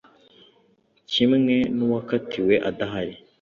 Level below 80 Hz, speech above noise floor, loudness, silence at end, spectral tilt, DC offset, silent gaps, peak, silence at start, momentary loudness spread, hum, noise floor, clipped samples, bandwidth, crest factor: -58 dBFS; 41 dB; -23 LUFS; 0.25 s; -6.5 dB/octave; under 0.1%; none; -6 dBFS; 1.1 s; 9 LU; none; -63 dBFS; under 0.1%; 7 kHz; 18 dB